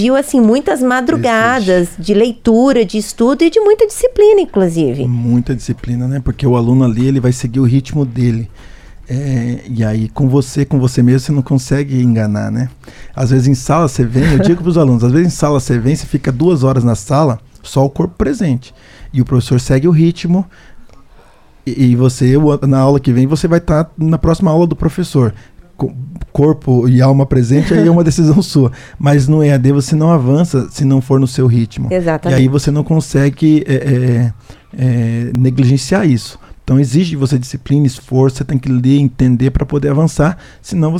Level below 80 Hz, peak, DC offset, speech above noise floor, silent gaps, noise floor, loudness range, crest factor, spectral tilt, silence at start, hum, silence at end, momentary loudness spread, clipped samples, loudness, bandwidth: -32 dBFS; 0 dBFS; under 0.1%; 31 dB; none; -42 dBFS; 3 LU; 12 dB; -7.5 dB/octave; 0 s; none; 0 s; 7 LU; under 0.1%; -12 LUFS; 14 kHz